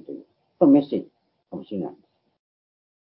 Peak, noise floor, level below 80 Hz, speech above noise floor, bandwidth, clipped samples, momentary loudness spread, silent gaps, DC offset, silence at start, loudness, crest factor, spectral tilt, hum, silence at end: -4 dBFS; -41 dBFS; -72 dBFS; 21 dB; 4.7 kHz; under 0.1%; 23 LU; none; under 0.1%; 0.1 s; -22 LUFS; 20 dB; -12.5 dB/octave; none; 1.2 s